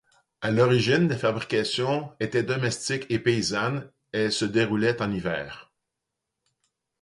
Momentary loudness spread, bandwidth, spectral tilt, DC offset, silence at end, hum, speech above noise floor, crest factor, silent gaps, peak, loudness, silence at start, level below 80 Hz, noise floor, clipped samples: 11 LU; 11.5 kHz; -5 dB/octave; under 0.1%; 1.4 s; none; 59 dB; 18 dB; none; -8 dBFS; -25 LUFS; 0.4 s; -58 dBFS; -84 dBFS; under 0.1%